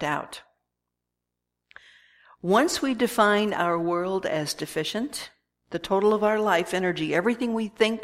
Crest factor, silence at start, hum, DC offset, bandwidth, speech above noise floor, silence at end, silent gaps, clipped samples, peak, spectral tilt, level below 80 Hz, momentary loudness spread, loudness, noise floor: 20 dB; 0 s; 60 Hz at -55 dBFS; under 0.1%; 16 kHz; 59 dB; 0 s; none; under 0.1%; -6 dBFS; -4.5 dB/octave; -62 dBFS; 13 LU; -25 LUFS; -84 dBFS